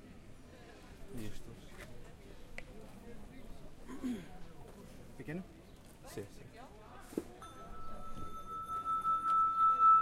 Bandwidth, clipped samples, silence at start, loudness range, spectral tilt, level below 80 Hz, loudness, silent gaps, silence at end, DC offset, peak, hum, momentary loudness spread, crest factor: 15.5 kHz; under 0.1%; 0 s; 16 LU; -5.5 dB/octave; -54 dBFS; -35 LUFS; none; 0 s; under 0.1%; -20 dBFS; none; 25 LU; 18 dB